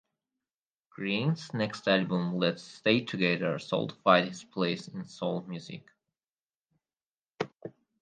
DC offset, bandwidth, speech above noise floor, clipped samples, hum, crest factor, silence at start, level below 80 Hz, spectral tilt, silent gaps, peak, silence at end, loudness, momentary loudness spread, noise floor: under 0.1%; 9.4 kHz; over 60 dB; under 0.1%; none; 26 dB; 1 s; -76 dBFS; -6 dB/octave; 6.41-6.69 s, 7.06-7.17 s, 7.25-7.29 s; -6 dBFS; 0.3 s; -30 LUFS; 16 LU; under -90 dBFS